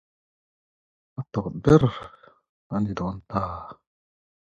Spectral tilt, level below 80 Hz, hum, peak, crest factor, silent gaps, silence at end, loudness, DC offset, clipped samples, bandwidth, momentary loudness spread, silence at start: -8.5 dB/octave; -48 dBFS; none; -2 dBFS; 24 dB; 2.49-2.70 s; 0.75 s; -24 LUFS; under 0.1%; under 0.1%; 7.8 kHz; 22 LU; 1.2 s